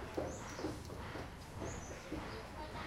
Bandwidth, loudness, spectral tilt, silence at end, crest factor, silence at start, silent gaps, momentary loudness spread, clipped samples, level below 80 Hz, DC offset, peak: 16 kHz; -46 LUFS; -5 dB/octave; 0 s; 20 dB; 0 s; none; 4 LU; under 0.1%; -54 dBFS; under 0.1%; -26 dBFS